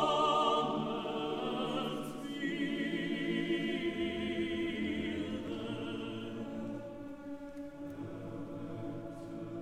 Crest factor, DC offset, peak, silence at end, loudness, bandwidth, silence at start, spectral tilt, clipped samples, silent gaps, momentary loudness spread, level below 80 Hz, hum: 20 dB; under 0.1%; -18 dBFS; 0 s; -37 LUFS; 14.5 kHz; 0 s; -5.5 dB/octave; under 0.1%; none; 13 LU; -62 dBFS; none